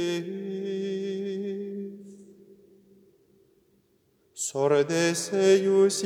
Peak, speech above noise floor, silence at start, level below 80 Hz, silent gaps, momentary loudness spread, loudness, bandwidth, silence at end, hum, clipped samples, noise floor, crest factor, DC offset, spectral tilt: -10 dBFS; 43 dB; 0 s; -82 dBFS; none; 16 LU; -26 LUFS; 14.5 kHz; 0 s; none; under 0.1%; -67 dBFS; 18 dB; under 0.1%; -4.5 dB/octave